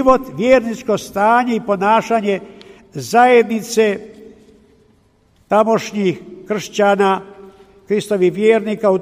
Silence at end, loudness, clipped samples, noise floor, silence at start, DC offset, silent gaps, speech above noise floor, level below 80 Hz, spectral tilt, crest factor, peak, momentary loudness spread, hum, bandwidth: 0 s; -16 LUFS; under 0.1%; -55 dBFS; 0 s; under 0.1%; none; 40 dB; -50 dBFS; -5 dB/octave; 16 dB; 0 dBFS; 9 LU; none; 15.5 kHz